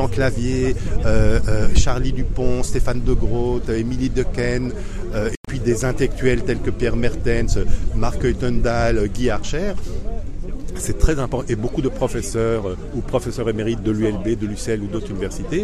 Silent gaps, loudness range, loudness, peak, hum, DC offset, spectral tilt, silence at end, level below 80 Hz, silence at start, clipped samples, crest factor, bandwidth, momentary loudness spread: 5.37-5.43 s; 2 LU; -22 LUFS; 0 dBFS; none; under 0.1%; -6 dB/octave; 0 s; -24 dBFS; 0 s; under 0.1%; 18 dB; 12 kHz; 7 LU